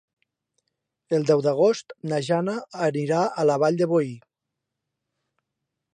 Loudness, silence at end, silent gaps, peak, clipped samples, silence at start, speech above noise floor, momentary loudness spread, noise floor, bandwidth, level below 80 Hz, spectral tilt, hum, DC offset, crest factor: -23 LUFS; 1.8 s; none; -8 dBFS; under 0.1%; 1.1 s; 62 dB; 8 LU; -84 dBFS; 9.8 kHz; -76 dBFS; -6.5 dB/octave; none; under 0.1%; 18 dB